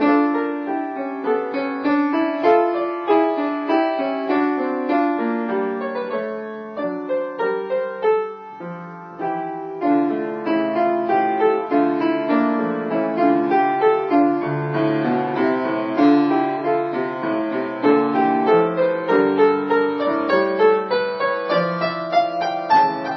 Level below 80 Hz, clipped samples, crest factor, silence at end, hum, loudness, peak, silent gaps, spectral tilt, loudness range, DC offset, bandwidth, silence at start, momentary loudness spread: -68 dBFS; under 0.1%; 16 dB; 0 s; none; -20 LUFS; -4 dBFS; none; -8 dB/octave; 5 LU; under 0.1%; 6 kHz; 0 s; 9 LU